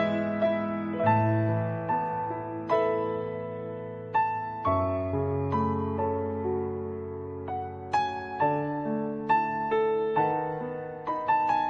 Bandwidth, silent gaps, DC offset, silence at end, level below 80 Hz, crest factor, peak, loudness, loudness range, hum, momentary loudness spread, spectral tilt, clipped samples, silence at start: 7.4 kHz; none; under 0.1%; 0 s; -60 dBFS; 16 dB; -12 dBFS; -29 LUFS; 3 LU; none; 9 LU; -8.5 dB/octave; under 0.1%; 0 s